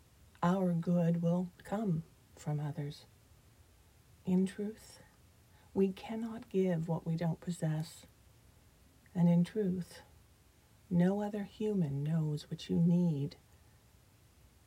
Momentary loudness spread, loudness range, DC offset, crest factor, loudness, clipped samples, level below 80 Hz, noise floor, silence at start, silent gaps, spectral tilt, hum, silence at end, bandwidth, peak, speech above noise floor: 13 LU; 5 LU; under 0.1%; 18 dB; -35 LUFS; under 0.1%; -66 dBFS; -65 dBFS; 0.4 s; none; -8.5 dB/octave; none; 1.3 s; 12 kHz; -18 dBFS; 31 dB